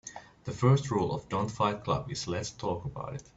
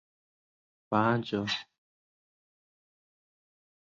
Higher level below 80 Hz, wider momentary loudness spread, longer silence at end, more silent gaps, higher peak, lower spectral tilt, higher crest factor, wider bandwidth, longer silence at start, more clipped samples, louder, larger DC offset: first, -56 dBFS vs -70 dBFS; first, 14 LU vs 7 LU; second, 0.15 s vs 2.35 s; neither; about the same, -12 dBFS vs -12 dBFS; about the same, -6 dB/octave vs -6 dB/octave; about the same, 20 dB vs 24 dB; about the same, 8 kHz vs 7.6 kHz; second, 0.05 s vs 0.9 s; neither; about the same, -31 LUFS vs -30 LUFS; neither